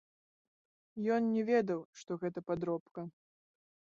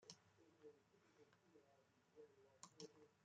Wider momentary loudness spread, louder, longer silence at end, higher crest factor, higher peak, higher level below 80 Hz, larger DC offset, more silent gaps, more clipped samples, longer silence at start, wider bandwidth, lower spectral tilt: first, 16 LU vs 8 LU; first, -35 LUFS vs -66 LUFS; first, 0.9 s vs 0 s; second, 18 dB vs 30 dB; first, -18 dBFS vs -38 dBFS; first, -76 dBFS vs under -90 dBFS; neither; first, 1.85-1.93 s, 2.80-2.95 s vs none; neither; first, 0.95 s vs 0 s; second, 7.6 kHz vs 8.8 kHz; first, -6.5 dB/octave vs -3 dB/octave